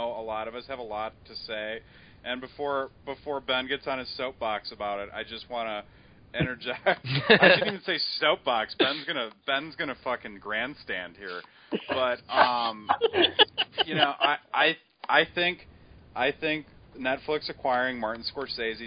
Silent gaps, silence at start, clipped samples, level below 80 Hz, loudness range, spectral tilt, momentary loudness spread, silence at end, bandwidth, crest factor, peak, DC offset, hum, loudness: none; 0 s; under 0.1%; -58 dBFS; 9 LU; -8.5 dB/octave; 14 LU; 0 s; 5.2 kHz; 26 dB; -4 dBFS; under 0.1%; none; -27 LUFS